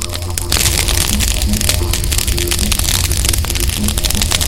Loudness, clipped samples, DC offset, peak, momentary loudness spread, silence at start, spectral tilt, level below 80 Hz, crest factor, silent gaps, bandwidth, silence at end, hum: -14 LUFS; under 0.1%; 0.9%; 0 dBFS; 3 LU; 0 s; -2.5 dB/octave; -18 dBFS; 14 dB; none; 17.5 kHz; 0 s; none